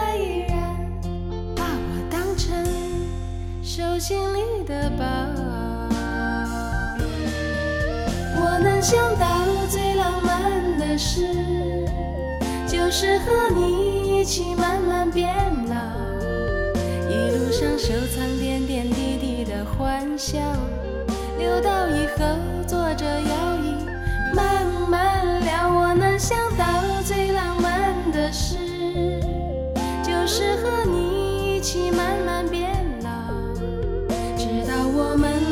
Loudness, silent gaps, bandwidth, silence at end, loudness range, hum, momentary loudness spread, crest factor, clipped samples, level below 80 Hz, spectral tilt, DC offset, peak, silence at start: -23 LUFS; none; 17 kHz; 0 s; 5 LU; none; 7 LU; 16 dB; under 0.1%; -30 dBFS; -5 dB/octave; under 0.1%; -6 dBFS; 0 s